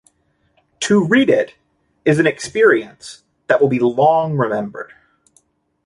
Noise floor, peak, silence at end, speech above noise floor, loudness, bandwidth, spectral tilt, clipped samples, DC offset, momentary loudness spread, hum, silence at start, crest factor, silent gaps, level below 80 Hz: -62 dBFS; -2 dBFS; 1 s; 47 dB; -16 LUFS; 11.5 kHz; -5.5 dB/octave; under 0.1%; under 0.1%; 20 LU; none; 0.8 s; 16 dB; none; -58 dBFS